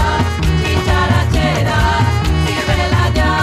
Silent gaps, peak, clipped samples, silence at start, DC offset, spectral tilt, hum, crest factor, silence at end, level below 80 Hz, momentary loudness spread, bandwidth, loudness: none; -2 dBFS; under 0.1%; 0 s; under 0.1%; -5.5 dB/octave; none; 12 dB; 0 s; -20 dBFS; 2 LU; 14.5 kHz; -14 LUFS